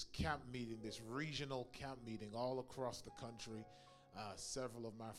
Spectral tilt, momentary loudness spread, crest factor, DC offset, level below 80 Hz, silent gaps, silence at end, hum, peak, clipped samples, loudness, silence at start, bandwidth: -4.5 dB/octave; 9 LU; 22 dB; under 0.1%; -64 dBFS; none; 0 s; none; -26 dBFS; under 0.1%; -48 LUFS; 0 s; 16 kHz